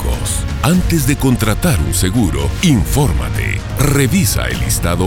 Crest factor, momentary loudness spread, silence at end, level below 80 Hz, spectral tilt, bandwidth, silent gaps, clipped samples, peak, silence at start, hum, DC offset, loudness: 14 dB; 5 LU; 0 s; -22 dBFS; -5 dB/octave; 18.5 kHz; none; under 0.1%; 0 dBFS; 0 s; none; under 0.1%; -15 LUFS